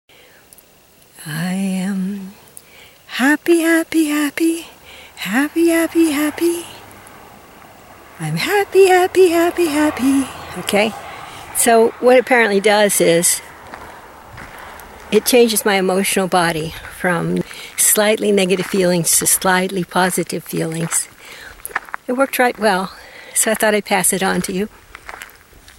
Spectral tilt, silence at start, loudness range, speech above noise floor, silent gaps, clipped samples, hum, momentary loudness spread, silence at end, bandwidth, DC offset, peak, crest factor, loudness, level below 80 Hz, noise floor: -3.5 dB/octave; 1.2 s; 5 LU; 34 dB; none; under 0.1%; none; 22 LU; 0.55 s; 16.5 kHz; under 0.1%; 0 dBFS; 16 dB; -16 LUFS; -52 dBFS; -49 dBFS